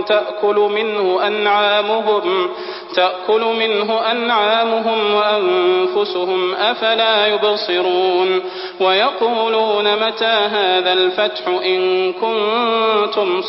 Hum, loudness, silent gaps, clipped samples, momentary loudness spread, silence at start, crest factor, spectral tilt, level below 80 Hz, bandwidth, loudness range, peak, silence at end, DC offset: none; -16 LUFS; none; under 0.1%; 4 LU; 0 s; 14 dB; -8 dB/octave; -64 dBFS; 5.8 kHz; 1 LU; -2 dBFS; 0 s; under 0.1%